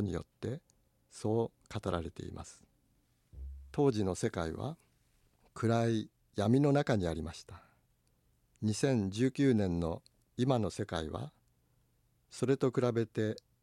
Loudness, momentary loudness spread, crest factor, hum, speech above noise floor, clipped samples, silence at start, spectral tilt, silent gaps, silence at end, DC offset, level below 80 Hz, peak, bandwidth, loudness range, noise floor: -34 LUFS; 19 LU; 20 dB; none; 40 dB; under 0.1%; 0 s; -7 dB/octave; none; 0.25 s; under 0.1%; -56 dBFS; -16 dBFS; 12.5 kHz; 5 LU; -73 dBFS